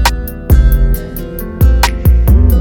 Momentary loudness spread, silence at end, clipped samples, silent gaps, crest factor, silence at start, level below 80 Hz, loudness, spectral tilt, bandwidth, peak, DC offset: 13 LU; 0 s; under 0.1%; none; 10 dB; 0 s; -10 dBFS; -12 LUFS; -5.5 dB/octave; 18.5 kHz; 0 dBFS; under 0.1%